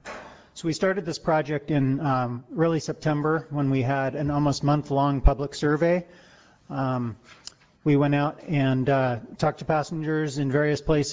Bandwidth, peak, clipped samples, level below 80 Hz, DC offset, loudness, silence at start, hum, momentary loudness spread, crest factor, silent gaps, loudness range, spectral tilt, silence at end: 8 kHz; -6 dBFS; under 0.1%; -38 dBFS; under 0.1%; -25 LUFS; 0.05 s; none; 8 LU; 18 dB; none; 2 LU; -7 dB/octave; 0 s